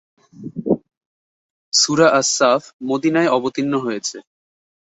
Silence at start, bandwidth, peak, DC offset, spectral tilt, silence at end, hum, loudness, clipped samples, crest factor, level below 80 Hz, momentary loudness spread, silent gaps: 0.4 s; 8.4 kHz; -2 dBFS; under 0.1%; -3 dB/octave; 0.65 s; none; -17 LUFS; under 0.1%; 18 dB; -62 dBFS; 13 LU; 0.97-1.72 s, 2.73-2.79 s